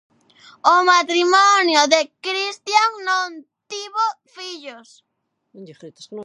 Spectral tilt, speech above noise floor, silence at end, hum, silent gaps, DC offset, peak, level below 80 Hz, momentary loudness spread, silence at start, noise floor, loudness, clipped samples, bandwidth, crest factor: -0.5 dB/octave; 39 dB; 0 s; none; none; under 0.1%; 0 dBFS; -80 dBFS; 20 LU; 0.65 s; -58 dBFS; -17 LUFS; under 0.1%; 11.5 kHz; 20 dB